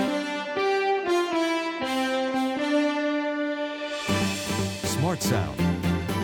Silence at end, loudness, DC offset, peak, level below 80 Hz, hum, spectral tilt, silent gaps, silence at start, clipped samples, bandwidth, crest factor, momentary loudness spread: 0 s; -26 LUFS; under 0.1%; -12 dBFS; -52 dBFS; none; -5 dB/octave; none; 0 s; under 0.1%; 19 kHz; 14 dB; 4 LU